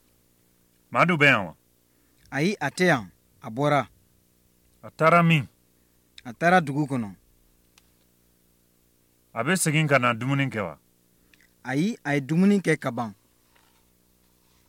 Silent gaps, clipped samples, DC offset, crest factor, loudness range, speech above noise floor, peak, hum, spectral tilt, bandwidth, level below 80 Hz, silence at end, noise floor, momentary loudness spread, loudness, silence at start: none; under 0.1%; under 0.1%; 20 dB; 4 LU; 41 dB; -6 dBFS; 60 Hz at -55 dBFS; -5.5 dB/octave; 16.5 kHz; -66 dBFS; 1.55 s; -64 dBFS; 19 LU; -23 LUFS; 0.9 s